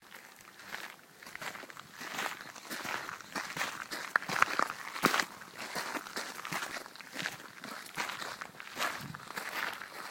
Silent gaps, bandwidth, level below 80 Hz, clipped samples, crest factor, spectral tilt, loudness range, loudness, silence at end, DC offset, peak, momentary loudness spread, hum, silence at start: none; 17 kHz; -76 dBFS; under 0.1%; 34 dB; -2 dB/octave; 6 LU; -37 LUFS; 0 s; under 0.1%; -4 dBFS; 15 LU; none; 0 s